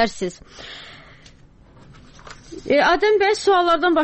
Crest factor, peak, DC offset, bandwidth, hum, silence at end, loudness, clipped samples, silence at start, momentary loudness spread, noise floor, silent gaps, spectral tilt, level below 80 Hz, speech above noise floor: 14 dB; -6 dBFS; under 0.1%; 8.8 kHz; none; 0 s; -18 LUFS; under 0.1%; 0 s; 22 LU; -48 dBFS; none; -3.5 dB/octave; -48 dBFS; 30 dB